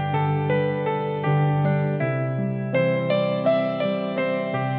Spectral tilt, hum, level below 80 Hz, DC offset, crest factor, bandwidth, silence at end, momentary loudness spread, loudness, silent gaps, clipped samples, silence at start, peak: -11 dB/octave; none; -68 dBFS; under 0.1%; 14 dB; 4.5 kHz; 0 s; 4 LU; -23 LUFS; none; under 0.1%; 0 s; -8 dBFS